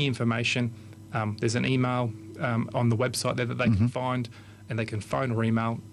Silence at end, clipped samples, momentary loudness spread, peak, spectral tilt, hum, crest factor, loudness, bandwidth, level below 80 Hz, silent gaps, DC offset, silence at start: 0 s; under 0.1%; 8 LU; -14 dBFS; -6 dB/octave; none; 14 dB; -28 LUFS; 12.5 kHz; -52 dBFS; none; under 0.1%; 0 s